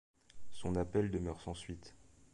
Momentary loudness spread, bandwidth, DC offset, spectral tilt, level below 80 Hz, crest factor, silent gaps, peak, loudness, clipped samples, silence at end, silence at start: 18 LU; 11.5 kHz; under 0.1%; -7 dB/octave; -54 dBFS; 18 dB; none; -22 dBFS; -39 LUFS; under 0.1%; 0 s; 0.15 s